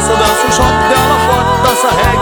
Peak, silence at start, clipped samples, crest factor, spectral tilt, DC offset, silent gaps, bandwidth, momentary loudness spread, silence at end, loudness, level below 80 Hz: 0 dBFS; 0 s; under 0.1%; 10 dB; -3.5 dB/octave; under 0.1%; none; over 20 kHz; 1 LU; 0 s; -10 LUFS; -24 dBFS